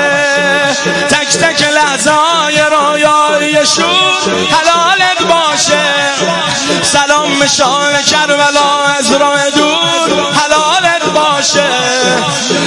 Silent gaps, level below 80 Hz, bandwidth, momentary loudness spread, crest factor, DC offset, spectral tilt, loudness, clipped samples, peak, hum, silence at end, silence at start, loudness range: none; -48 dBFS; 12 kHz; 2 LU; 10 dB; under 0.1%; -2 dB/octave; -9 LUFS; under 0.1%; 0 dBFS; none; 0 s; 0 s; 1 LU